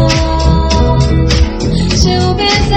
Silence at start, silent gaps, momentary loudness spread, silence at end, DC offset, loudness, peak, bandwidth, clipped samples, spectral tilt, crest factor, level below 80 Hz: 0 s; none; 2 LU; 0 s; under 0.1%; -11 LUFS; 0 dBFS; 8.8 kHz; 0.2%; -5.5 dB/octave; 10 dB; -14 dBFS